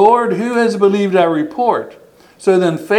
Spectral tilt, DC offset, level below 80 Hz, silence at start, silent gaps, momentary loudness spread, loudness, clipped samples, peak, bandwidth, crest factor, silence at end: -6.5 dB/octave; under 0.1%; -60 dBFS; 0 s; none; 6 LU; -14 LUFS; under 0.1%; 0 dBFS; 12.5 kHz; 14 dB; 0 s